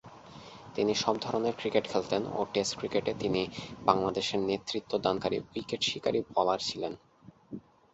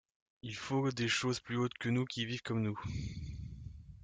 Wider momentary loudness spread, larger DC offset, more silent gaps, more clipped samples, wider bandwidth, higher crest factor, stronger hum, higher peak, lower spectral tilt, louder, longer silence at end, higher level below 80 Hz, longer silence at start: first, 19 LU vs 15 LU; neither; neither; neither; second, 8.2 kHz vs 9.4 kHz; first, 26 dB vs 16 dB; neither; first, -6 dBFS vs -20 dBFS; about the same, -4 dB/octave vs -5 dB/octave; first, -31 LUFS vs -37 LUFS; first, 0.35 s vs 0 s; second, -62 dBFS vs -56 dBFS; second, 0.05 s vs 0.45 s